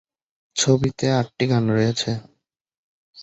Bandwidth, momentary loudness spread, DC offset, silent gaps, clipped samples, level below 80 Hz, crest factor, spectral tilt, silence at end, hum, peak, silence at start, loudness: 8.2 kHz; 8 LU; under 0.1%; 2.61-2.65 s, 2.77-3.13 s; under 0.1%; -52 dBFS; 20 dB; -5 dB/octave; 0 s; none; -4 dBFS; 0.55 s; -21 LUFS